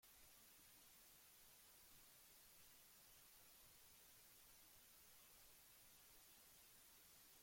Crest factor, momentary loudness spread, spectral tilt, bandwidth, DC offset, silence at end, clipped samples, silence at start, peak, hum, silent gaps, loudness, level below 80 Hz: 14 dB; 0 LU; -0.5 dB/octave; 16.5 kHz; under 0.1%; 0 s; under 0.1%; 0 s; -56 dBFS; none; none; -66 LUFS; -84 dBFS